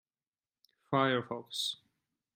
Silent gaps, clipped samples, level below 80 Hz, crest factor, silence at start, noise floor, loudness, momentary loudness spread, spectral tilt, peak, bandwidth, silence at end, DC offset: none; under 0.1%; -80 dBFS; 22 dB; 0.9 s; under -90 dBFS; -33 LUFS; 9 LU; -4.5 dB/octave; -14 dBFS; 16 kHz; 0.6 s; under 0.1%